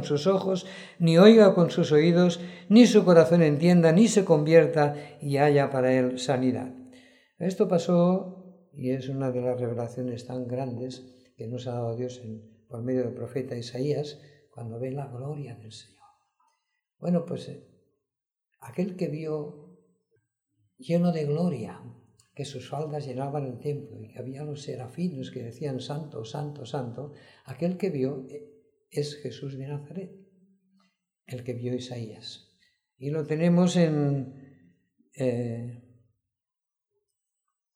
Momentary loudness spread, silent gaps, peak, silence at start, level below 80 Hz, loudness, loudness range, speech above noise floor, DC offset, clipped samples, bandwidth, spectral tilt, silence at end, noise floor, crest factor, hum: 21 LU; none; -4 dBFS; 0 s; -72 dBFS; -25 LUFS; 17 LU; 65 dB; under 0.1%; under 0.1%; 11.5 kHz; -7 dB/octave; 1.95 s; -90 dBFS; 22 dB; none